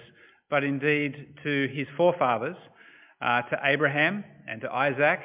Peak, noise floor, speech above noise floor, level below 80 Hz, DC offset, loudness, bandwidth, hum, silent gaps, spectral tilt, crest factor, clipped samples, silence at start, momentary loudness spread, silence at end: -8 dBFS; -55 dBFS; 29 dB; -74 dBFS; under 0.1%; -26 LUFS; 3.9 kHz; none; none; -9 dB/octave; 18 dB; under 0.1%; 0 s; 13 LU; 0 s